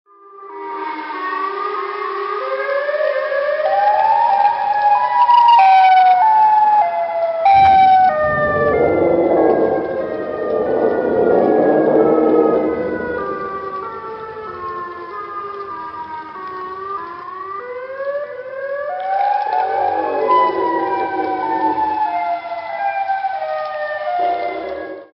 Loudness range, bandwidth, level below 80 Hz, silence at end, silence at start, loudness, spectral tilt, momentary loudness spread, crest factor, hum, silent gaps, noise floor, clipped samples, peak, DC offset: 15 LU; 5.8 kHz; -52 dBFS; 0.1 s; 0.35 s; -16 LUFS; -7.5 dB/octave; 17 LU; 16 dB; none; none; -37 dBFS; under 0.1%; 0 dBFS; under 0.1%